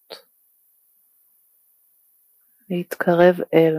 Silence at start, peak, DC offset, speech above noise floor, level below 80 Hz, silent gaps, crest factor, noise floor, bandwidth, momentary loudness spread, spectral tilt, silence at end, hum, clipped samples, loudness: 0.1 s; -2 dBFS; under 0.1%; 44 dB; -72 dBFS; none; 20 dB; -61 dBFS; 15.5 kHz; 25 LU; -7.5 dB/octave; 0 s; none; under 0.1%; -19 LUFS